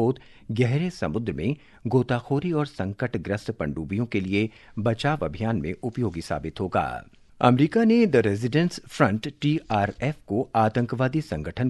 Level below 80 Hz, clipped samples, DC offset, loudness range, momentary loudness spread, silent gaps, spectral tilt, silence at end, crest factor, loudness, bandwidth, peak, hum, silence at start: -48 dBFS; under 0.1%; under 0.1%; 5 LU; 10 LU; none; -7.5 dB/octave; 0 s; 22 dB; -25 LUFS; 12 kHz; -2 dBFS; none; 0 s